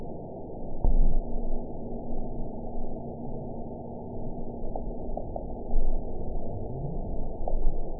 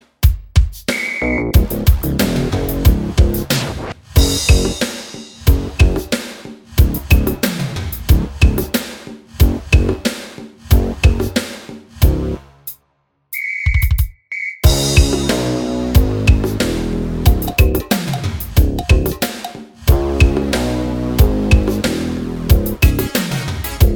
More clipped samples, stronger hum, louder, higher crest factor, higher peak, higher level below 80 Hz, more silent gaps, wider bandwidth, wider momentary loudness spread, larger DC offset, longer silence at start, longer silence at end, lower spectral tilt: neither; neither; second, -36 LUFS vs -16 LUFS; about the same, 16 dB vs 16 dB; second, -10 dBFS vs 0 dBFS; second, -28 dBFS vs -18 dBFS; neither; second, 1 kHz vs over 20 kHz; second, 7 LU vs 10 LU; first, 0.5% vs under 0.1%; second, 0 s vs 0.2 s; about the same, 0 s vs 0 s; first, -16.5 dB/octave vs -5.5 dB/octave